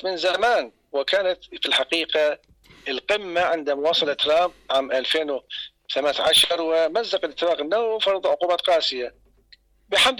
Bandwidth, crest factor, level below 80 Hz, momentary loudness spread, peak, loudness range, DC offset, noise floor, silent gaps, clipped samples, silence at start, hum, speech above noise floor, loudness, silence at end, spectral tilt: 17.5 kHz; 14 dB; -60 dBFS; 10 LU; -10 dBFS; 2 LU; under 0.1%; -56 dBFS; none; under 0.1%; 0 s; none; 34 dB; -22 LUFS; 0 s; -1.5 dB/octave